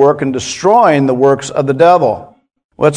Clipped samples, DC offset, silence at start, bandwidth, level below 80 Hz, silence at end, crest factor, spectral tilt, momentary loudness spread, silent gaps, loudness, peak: 0.5%; under 0.1%; 0 s; 10.5 kHz; -50 dBFS; 0 s; 12 dB; -5.5 dB/octave; 8 LU; 2.64-2.69 s; -11 LUFS; 0 dBFS